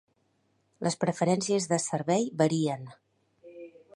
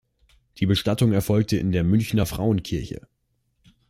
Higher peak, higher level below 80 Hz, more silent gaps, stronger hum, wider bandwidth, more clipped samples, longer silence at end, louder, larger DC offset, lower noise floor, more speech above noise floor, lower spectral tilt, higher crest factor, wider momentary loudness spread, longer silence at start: about the same, -10 dBFS vs -8 dBFS; second, -74 dBFS vs -44 dBFS; neither; neither; second, 11.5 kHz vs 15.5 kHz; neither; second, 0.25 s vs 0.9 s; second, -28 LUFS vs -23 LUFS; neither; first, -72 dBFS vs -65 dBFS; about the same, 44 dB vs 43 dB; second, -5 dB/octave vs -6.5 dB/octave; about the same, 20 dB vs 16 dB; first, 22 LU vs 9 LU; first, 0.8 s vs 0.55 s